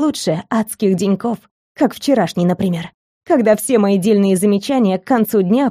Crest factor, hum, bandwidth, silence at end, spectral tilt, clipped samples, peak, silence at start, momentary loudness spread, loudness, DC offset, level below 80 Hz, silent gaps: 14 dB; none; 15.5 kHz; 0 s; -6 dB/octave; under 0.1%; -2 dBFS; 0 s; 7 LU; -16 LUFS; under 0.1%; -56 dBFS; 1.51-1.75 s, 2.94-3.21 s